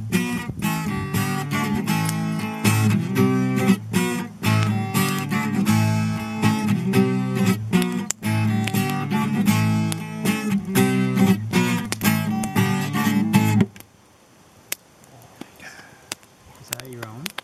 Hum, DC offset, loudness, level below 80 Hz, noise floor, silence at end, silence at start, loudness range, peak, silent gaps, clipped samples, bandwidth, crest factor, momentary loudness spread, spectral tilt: none; under 0.1%; -22 LUFS; -54 dBFS; -53 dBFS; 0.15 s; 0 s; 4 LU; 0 dBFS; none; under 0.1%; 15.5 kHz; 22 dB; 13 LU; -5.5 dB/octave